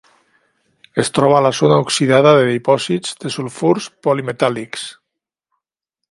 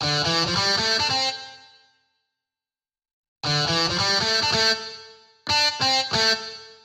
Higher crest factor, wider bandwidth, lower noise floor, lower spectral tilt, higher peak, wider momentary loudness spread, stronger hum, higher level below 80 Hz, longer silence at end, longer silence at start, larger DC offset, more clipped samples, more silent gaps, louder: about the same, 16 dB vs 16 dB; second, 11.5 kHz vs 16 kHz; second, -81 dBFS vs under -90 dBFS; first, -5 dB/octave vs -2 dB/octave; first, 0 dBFS vs -8 dBFS; second, 13 LU vs 16 LU; neither; second, -60 dBFS vs -54 dBFS; first, 1.2 s vs 0.1 s; first, 0.95 s vs 0 s; neither; neither; second, none vs 3.13-3.36 s; first, -15 LUFS vs -20 LUFS